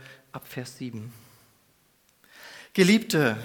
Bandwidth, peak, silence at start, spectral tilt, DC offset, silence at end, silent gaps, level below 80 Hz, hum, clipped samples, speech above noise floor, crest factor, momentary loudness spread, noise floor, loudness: 19 kHz; -6 dBFS; 0.1 s; -5 dB/octave; under 0.1%; 0 s; none; -70 dBFS; none; under 0.1%; 40 dB; 22 dB; 24 LU; -64 dBFS; -25 LUFS